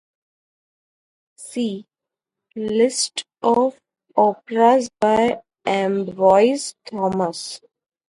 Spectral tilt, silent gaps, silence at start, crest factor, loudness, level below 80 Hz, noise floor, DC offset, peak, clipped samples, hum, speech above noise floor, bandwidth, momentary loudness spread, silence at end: -4 dB/octave; none; 1.4 s; 18 dB; -20 LUFS; -62 dBFS; -86 dBFS; under 0.1%; -2 dBFS; under 0.1%; none; 67 dB; 11.5 kHz; 15 LU; 0.5 s